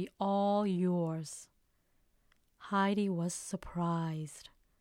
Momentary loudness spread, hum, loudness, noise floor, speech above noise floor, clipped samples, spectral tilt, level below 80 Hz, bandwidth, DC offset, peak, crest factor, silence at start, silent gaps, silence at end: 15 LU; none; -34 LUFS; -73 dBFS; 39 dB; under 0.1%; -6 dB/octave; -66 dBFS; 13.5 kHz; under 0.1%; -20 dBFS; 16 dB; 0 s; none; 0.35 s